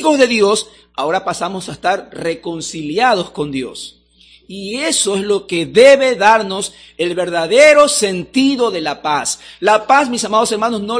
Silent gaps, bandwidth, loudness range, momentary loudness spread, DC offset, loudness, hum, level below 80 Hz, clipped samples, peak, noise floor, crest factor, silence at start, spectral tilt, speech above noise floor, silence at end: none; 11 kHz; 8 LU; 15 LU; under 0.1%; -14 LUFS; none; -54 dBFS; 0.4%; 0 dBFS; -48 dBFS; 14 dB; 0 s; -3 dB/octave; 34 dB; 0 s